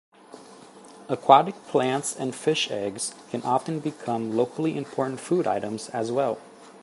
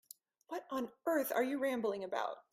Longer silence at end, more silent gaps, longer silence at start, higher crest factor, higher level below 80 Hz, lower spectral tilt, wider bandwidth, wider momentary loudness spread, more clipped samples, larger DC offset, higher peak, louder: about the same, 0.05 s vs 0.1 s; neither; second, 0.3 s vs 0.5 s; first, 26 dB vs 18 dB; first, -72 dBFS vs -84 dBFS; about the same, -4.5 dB/octave vs -4 dB/octave; second, 12 kHz vs 16 kHz; about the same, 13 LU vs 12 LU; neither; neither; first, 0 dBFS vs -20 dBFS; first, -25 LUFS vs -38 LUFS